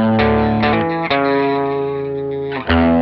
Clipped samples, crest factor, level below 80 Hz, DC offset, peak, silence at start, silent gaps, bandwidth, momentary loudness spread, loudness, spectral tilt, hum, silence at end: under 0.1%; 14 dB; -32 dBFS; under 0.1%; -2 dBFS; 0 s; none; 5.8 kHz; 8 LU; -17 LUFS; -9.5 dB/octave; none; 0 s